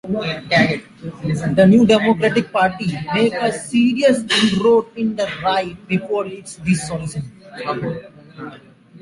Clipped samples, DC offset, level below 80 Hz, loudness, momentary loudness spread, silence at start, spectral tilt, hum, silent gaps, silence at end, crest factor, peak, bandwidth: under 0.1%; under 0.1%; -50 dBFS; -17 LUFS; 15 LU; 0.05 s; -5.5 dB/octave; none; none; 0.05 s; 16 dB; -2 dBFS; 11.5 kHz